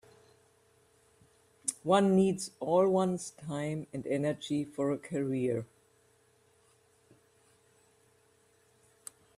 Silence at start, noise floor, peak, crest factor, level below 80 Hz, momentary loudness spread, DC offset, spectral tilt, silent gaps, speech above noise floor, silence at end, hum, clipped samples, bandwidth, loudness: 1.65 s; -68 dBFS; -12 dBFS; 22 dB; -74 dBFS; 12 LU; under 0.1%; -6 dB/octave; none; 37 dB; 3.7 s; none; under 0.1%; 14 kHz; -31 LUFS